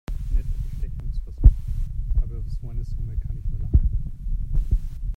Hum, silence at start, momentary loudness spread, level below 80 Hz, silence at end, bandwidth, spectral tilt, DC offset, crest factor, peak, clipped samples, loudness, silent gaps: none; 0.1 s; 13 LU; -24 dBFS; 0 s; 2.5 kHz; -9.5 dB/octave; under 0.1%; 22 dB; 0 dBFS; under 0.1%; -27 LUFS; none